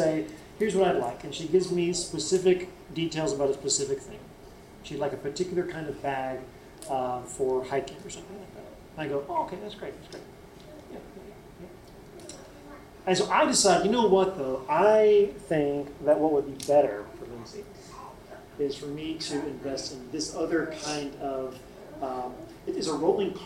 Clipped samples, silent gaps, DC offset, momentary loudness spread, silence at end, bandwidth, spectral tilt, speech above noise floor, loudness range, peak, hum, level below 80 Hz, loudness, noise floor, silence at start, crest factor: under 0.1%; none; under 0.1%; 23 LU; 0 s; 15.5 kHz; -4 dB/octave; 21 dB; 14 LU; -8 dBFS; none; -56 dBFS; -27 LUFS; -48 dBFS; 0 s; 20 dB